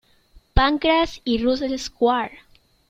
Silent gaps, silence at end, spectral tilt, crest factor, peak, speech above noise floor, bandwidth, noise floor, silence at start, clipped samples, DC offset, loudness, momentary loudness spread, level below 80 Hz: none; 0.55 s; -5 dB/octave; 20 dB; -2 dBFS; 33 dB; 15.5 kHz; -53 dBFS; 0.55 s; under 0.1%; under 0.1%; -21 LUFS; 7 LU; -34 dBFS